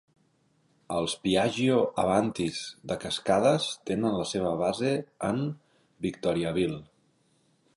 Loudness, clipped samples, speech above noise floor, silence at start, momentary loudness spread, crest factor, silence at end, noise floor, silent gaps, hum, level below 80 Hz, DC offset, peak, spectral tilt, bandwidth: -28 LUFS; under 0.1%; 41 dB; 0.9 s; 10 LU; 18 dB; 0.9 s; -68 dBFS; none; none; -58 dBFS; under 0.1%; -10 dBFS; -5 dB/octave; 11.5 kHz